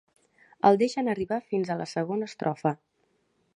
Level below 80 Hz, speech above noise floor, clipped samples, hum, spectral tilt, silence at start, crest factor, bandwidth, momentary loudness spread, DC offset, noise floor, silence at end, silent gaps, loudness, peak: -68 dBFS; 45 dB; under 0.1%; none; -6.5 dB/octave; 0.65 s; 22 dB; 10.5 kHz; 9 LU; under 0.1%; -71 dBFS; 0.8 s; none; -27 LUFS; -6 dBFS